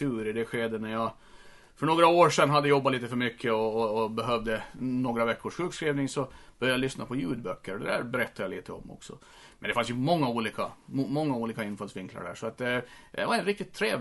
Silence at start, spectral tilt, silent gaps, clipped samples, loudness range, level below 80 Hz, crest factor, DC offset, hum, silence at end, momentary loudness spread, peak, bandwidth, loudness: 0 s; -5.5 dB/octave; none; under 0.1%; 7 LU; -58 dBFS; 22 dB; under 0.1%; none; 0 s; 15 LU; -8 dBFS; 11.5 kHz; -29 LUFS